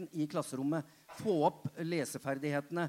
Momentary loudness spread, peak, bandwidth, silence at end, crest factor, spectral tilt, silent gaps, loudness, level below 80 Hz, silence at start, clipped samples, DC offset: 8 LU; -16 dBFS; 16 kHz; 0 s; 18 dB; -6 dB/octave; none; -36 LUFS; -78 dBFS; 0 s; under 0.1%; under 0.1%